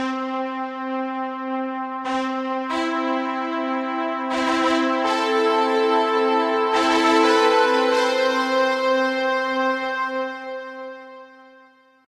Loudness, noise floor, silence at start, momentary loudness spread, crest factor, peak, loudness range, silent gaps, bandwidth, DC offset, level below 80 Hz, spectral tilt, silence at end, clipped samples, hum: -21 LUFS; -53 dBFS; 0 s; 11 LU; 16 dB; -6 dBFS; 7 LU; none; 13.5 kHz; under 0.1%; -62 dBFS; -2.5 dB/octave; 0.65 s; under 0.1%; none